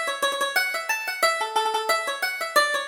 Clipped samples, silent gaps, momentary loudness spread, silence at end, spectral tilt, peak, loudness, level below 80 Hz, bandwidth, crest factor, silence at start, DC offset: under 0.1%; none; 4 LU; 0 s; 1.5 dB/octave; -6 dBFS; -23 LUFS; -68 dBFS; over 20 kHz; 18 dB; 0 s; under 0.1%